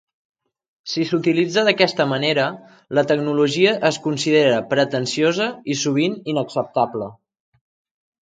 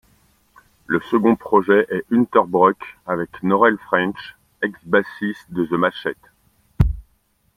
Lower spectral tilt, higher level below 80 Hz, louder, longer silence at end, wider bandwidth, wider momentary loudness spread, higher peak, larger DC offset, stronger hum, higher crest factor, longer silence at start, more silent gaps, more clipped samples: second, -4.5 dB/octave vs -8 dB/octave; second, -66 dBFS vs -36 dBFS; about the same, -19 LUFS vs -19 LUFS; first, 1.1 s vs 0.55 s; second, 9.4 kHz vs 15.5 kHz; second, 8 LU vs 12 LU; about the same, 0 dBFS vs -2 dBFS; neither; neither; about the same, 20 dB vs 18 dB; about the same, 0.85 s vs 0.9 s; neither; neither